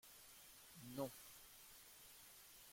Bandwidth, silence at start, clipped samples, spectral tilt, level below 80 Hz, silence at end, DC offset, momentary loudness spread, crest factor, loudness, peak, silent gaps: 16.5 kHz; 0.05 s; under 0.1%; -4 dB/octave; -80 dBFS; 0 s; under 0.1%; 11 LU; 24 dB; -56 LUFS; -34 dBFS; none